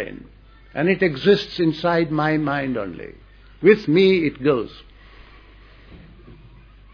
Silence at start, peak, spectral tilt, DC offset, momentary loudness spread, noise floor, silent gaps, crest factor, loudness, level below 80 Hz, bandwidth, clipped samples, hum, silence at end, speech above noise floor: 0 s; -2 dBFS; -7.5 dB/octave; under 0.1%; 17 LU; -46 dBFS; none; 20 dB; -19 LUFS; -48 dBFS; 5.4 kHz; under 0.1%; none; 0.6 s; 27 dB